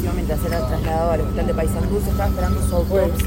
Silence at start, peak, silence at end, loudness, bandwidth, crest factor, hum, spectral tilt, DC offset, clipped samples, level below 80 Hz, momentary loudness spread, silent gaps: 0 s; -6 dBFS; 0 s; -21 LUFS; 16.5 kHz; 14 dB; none; -7 dB/octave; under 0.1%; under 0.1%; -24 dBFS; 3 LU; none